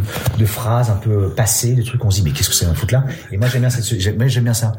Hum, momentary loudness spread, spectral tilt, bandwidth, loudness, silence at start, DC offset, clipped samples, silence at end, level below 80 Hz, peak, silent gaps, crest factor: none; 4 LU; -4.5 dB/octave; 16.5 kHz; -16 LUFS; 0 s; under 0.1%; under 0.1%; 0 s; -38 dBFS; -2 dBFS; none; 14 dB